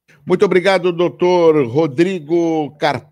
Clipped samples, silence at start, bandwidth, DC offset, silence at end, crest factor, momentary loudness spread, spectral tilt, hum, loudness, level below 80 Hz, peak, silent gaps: under 0.1%; 0.25 s; 10.5 kHz; under 0.1%; 0.1 s; 14 dB; 6 LU; -6.5 dB/octave; none; -15 LUFS; -62 dBFS; -2 dBFS; none